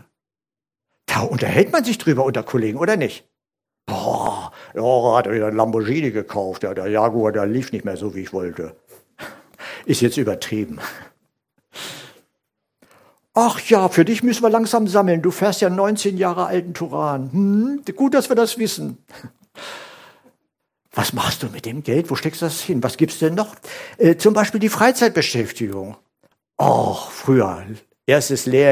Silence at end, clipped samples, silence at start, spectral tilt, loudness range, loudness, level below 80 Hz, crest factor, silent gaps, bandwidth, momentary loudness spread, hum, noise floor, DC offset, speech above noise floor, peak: 0 s; under 0.1%; 1.1 s; -5 dB/octave; 8 LU; -19 LUFS; -56 dBFS; 20 dB; none; 16 kHz; 17 LU; none; under -90 dBFS; under 0.1%; over 72 dB; 0 dBFS